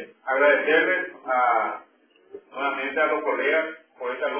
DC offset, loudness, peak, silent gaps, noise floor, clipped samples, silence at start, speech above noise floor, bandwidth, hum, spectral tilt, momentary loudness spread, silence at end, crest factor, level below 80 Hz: under 0.1%; -23 LUFS; -6 dBFS; none; -47 dBFS; under 0.1%; 0 s; 24 dB; 3.5 kHz; none; -6 dB/octave; 14 LU; 0 s; 18 dB; -80 dBFS